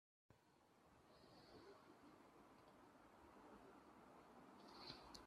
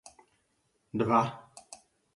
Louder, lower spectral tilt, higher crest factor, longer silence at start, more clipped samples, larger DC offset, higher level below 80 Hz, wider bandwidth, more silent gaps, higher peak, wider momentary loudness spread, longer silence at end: second, -65 LUFS vs -29 LUFS; second, -4 dB/octave vs -6.5 dB/octave; first, 28 dB vs 22 dB; second, 0.3 s vs 0.95 s; neither; neither; second, -84 dBFS vs -68 dBFS; first, 13 kHz vs 11.5 kHz; neither; second, -38 dBFS vs -12 dBFS; second, 10 LU vs 24 LU; second, 0 s vs 0.4 s